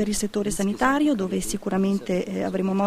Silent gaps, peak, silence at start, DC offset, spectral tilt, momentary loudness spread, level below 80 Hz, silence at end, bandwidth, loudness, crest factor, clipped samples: none; -6 dBFS; 0 s; under 0.1%; -5 dB/octave; 6 LU; -44 dBFS; 0 s; 15 kHz; -24 LUFS; 18 dB; under 0.1%